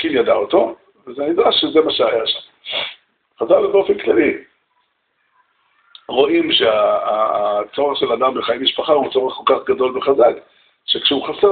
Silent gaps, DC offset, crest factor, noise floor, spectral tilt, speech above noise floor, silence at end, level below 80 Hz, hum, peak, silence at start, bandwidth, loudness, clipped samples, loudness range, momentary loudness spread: none; under 0.1%; 16 dB; -66 dBFS; -1 dB/octave; 50 dB; 0 s; -58 dBFS; none; -2 dBFS; 0 s; 4.7 kHz; -16 LUFS; under 0.1%; 3 LU; 9 LU